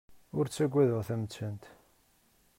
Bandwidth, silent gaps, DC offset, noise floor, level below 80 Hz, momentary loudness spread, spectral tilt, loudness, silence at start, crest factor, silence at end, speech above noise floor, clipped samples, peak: 16 kHz; none; under 0.1%; -68 dBFS; -68 dBFS; 13 LU; -7 dB/octave; -32 LUFS; 0.1 s; 18 dB; 0.9 s; 37 dB; under 0.1%; -16 dBFS